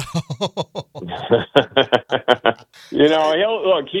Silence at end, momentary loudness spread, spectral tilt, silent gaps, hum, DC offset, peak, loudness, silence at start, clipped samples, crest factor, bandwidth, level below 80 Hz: 0 s; 14 LU; -5.5 dB/octave; none; none; under 0.1%; 0 dBFS; -18 LUFS; 0 s; under 0.1%; 18 dB; 12.5 kHz; -54 dBFS